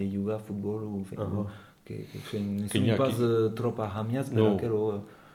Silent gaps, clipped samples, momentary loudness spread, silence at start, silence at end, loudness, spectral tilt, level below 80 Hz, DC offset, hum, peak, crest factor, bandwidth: none; under 0.1%; 14 LU; 0 s; 0.05 s; -30 LUFS; -7 dB/octave; -64 dBFS; under 0.1%; none; -10 dBFS; 20 dB; 16.5 kHz